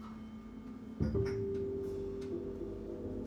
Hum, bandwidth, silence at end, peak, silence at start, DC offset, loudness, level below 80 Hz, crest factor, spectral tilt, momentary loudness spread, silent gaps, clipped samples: none; 9.6 kHz; 0 s; -20 dBFS; 0 s; under 0.1%; -40 LUFS; -50 dBFS; 18 dB; -9 dB/octave; 13 LU; none; under 0.1%